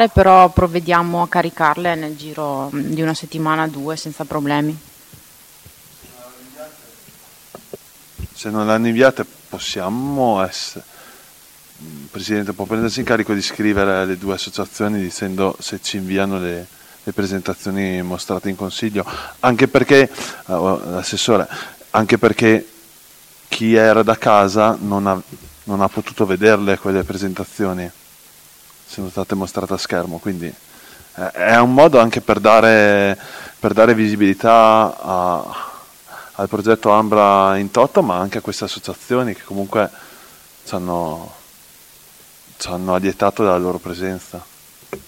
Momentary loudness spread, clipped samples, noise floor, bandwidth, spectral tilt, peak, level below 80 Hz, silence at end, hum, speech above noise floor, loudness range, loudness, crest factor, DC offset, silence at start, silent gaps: 18 LU; 0.2%; -45 dBFS; 17 kHz; -5.5 dB/octave; 0 dBFS; -44 dBFS; 0.1 s; none; 29 dB; 11 LU; -16 LUFS; 18 dB; under 0.1%; 0 s; none